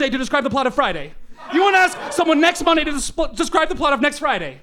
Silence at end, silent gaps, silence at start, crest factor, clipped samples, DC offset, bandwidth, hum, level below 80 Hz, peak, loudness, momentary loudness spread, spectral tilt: 0.05 s; none; 0 s; 16 dB; under 0.1%; under 0.1%; 16 kHz; none; -38 dBFS; -2 dBFS; -18 LUFS; 8 LU; -3 dB/octave